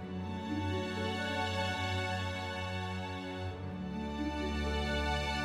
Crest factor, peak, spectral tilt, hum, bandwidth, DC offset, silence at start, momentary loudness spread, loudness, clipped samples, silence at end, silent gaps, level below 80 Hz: 14 dB; -22 dBFS; -5.5 dB/octave; none; 14 kHz; under 0.1%; 0 s; 7 LU; -36 LUFS; under 0.1%; 0 s; none; -46 dBFS